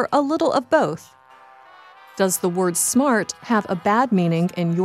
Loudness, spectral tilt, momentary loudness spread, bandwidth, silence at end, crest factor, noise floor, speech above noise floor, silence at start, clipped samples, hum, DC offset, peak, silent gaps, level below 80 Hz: -20 LUFS; -5 dB/octave; 5 LU; 15.5 kHz; 0 s; 16 dB; -48 dBFS; 28 dB; 0 s; under 0.1%; none; under 0.1%; -4 dBFS; none; -66 dBFS